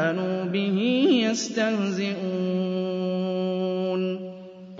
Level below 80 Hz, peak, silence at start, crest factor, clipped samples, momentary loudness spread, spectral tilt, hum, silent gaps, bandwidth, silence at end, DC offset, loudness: -74 dBFS; -10 dBFS; 0 s; 14 dB; under 0.1%; 7 LU; -5.5 dB/octave; none; none; 7.8 kHz; 0 s; under 0.1%; -25 LUFS